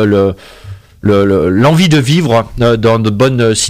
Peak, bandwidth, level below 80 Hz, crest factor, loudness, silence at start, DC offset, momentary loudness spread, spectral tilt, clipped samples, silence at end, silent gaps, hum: -2 dBFS; 16 kHz; -34 dBFS; 8 dB; -10 LUFS; 0 s; under 0.1%; 4 LU; -5.5 dB/octave; under 0.1%; 0 s; none; none